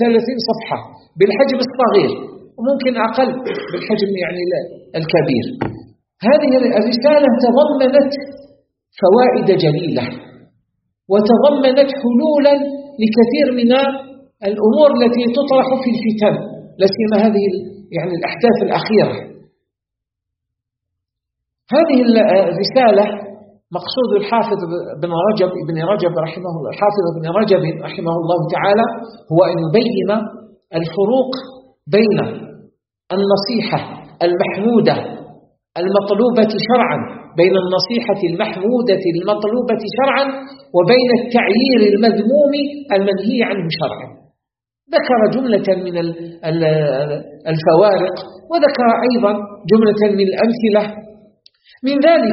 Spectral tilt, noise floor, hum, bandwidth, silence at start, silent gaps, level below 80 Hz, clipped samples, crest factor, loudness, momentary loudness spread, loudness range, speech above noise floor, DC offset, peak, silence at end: -4.5 dB/octave; -83 dBFS; none; 6 kHz; 0 s; none; -58 dBFS; under 0.1%; 16 dB; -15 LUFS; 12 LU; 4 LU; 69 dB; under 0.1%; 0 dBFS; 0 s